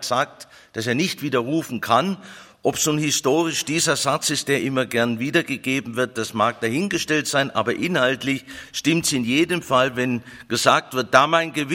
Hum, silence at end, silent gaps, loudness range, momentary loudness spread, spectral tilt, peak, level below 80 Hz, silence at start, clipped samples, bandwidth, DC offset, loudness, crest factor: none; 0 s; none; 2 LU; 7 LU; -3.5 dB/octave; 0 dBFS; -60 dBFS; 0 s; under 0.1%; 16.5 kHz; under 0.1%; -21 LUFS; 22 dB